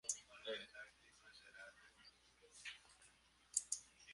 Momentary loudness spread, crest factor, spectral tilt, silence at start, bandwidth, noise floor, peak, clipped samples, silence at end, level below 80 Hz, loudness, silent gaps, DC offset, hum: 22 LU; 34 dB; 1 dB/octave; 0.05 s; 11.5 kHz; -72 dBFS; -18 dBFS; under 0.1%; 0 s; -82 dBFS; -48 LUFS; none; under 0.1%; none